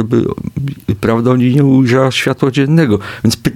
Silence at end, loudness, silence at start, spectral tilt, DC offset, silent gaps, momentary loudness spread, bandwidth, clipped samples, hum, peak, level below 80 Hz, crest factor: 0 s; -12 LUFS; 0 s; -6.5 dB/octave; under 0.1%; none; 10 LU; 16 kHz; under 0.1%; none; 0 dBFS; -40 dBFS; 12 dB